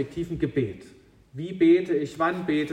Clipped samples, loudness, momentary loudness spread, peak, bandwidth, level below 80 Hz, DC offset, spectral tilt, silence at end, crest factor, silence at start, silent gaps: under 0.1%; -25 LUFS; 17 LU; -10 dBFS; 9.2 kHz; -54 dBFS; under 0.1%; -7.5 dB/octave; 0 s; 16 dB; 0 s; none